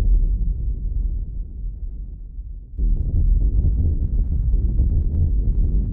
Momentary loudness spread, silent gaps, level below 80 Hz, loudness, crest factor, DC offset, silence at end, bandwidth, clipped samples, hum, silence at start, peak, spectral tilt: 14 LU; none; -20 dBFS; -23 LUFS; 10 dB; under 0.1%; 0 s; 0.8 kHz; under 0.1%; none; 0 s; -8 dBFS; -14.5 dB/octave